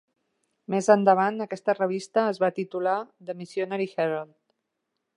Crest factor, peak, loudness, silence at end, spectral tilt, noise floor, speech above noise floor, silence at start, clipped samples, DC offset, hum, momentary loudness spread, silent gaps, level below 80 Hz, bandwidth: 22 dB; -6 dBFS; -25 LUFS; 0.9 s; -6 dB/octave; -81 dBFS; 56 dB; 0.7 s; under 0.1%; under 0.1%; none; 14 LU; none; -82 dBFS; 11 kHz